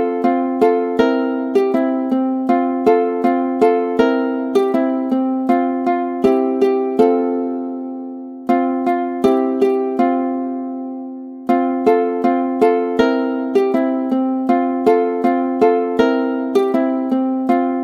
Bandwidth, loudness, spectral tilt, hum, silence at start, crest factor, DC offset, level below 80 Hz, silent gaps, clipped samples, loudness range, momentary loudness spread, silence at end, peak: 7 kHz; -17 LUFS; -6.5 dB/octave; none; 0 s; 16 dB; under 0.1%; -58 dBFS; none; under 0.1%; 2 LU; 6 LU; 0 s; 0 dBFS